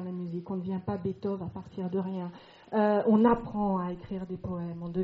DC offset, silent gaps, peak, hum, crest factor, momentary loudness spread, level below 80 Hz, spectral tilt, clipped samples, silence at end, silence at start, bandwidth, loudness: under 0.1%; none; -12 dBFS; none; 18 dB; 14 LU; -56 dBFS; -8 dB/octave; under 0.1%; 0 s; 0 s; 5.2 kHz; -30 LUFS